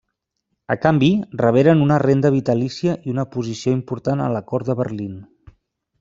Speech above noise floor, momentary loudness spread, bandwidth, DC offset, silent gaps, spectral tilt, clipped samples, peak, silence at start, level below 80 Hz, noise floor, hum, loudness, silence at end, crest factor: 58 dB; 11 LU; 7.6 kHz; under 0.1%; none; -7.5 dB/octave; under 0.1%; -2 dBFS; 0.7 s; -54 dBFS; -76 dBFS; none; -19 LUFS; 0.75 s; 18 dB